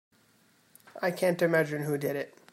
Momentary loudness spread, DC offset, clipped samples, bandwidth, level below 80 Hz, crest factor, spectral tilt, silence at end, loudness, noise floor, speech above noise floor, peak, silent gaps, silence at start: 9 LU; under 0.1%; under 0.1%; 16 kHz; -76 dBFS; 18 dB; -6 dB/octave; 0.25 s; -29 LUFS; -65 dBFS; 36 dB; -12 dBFS; none; 0.95 s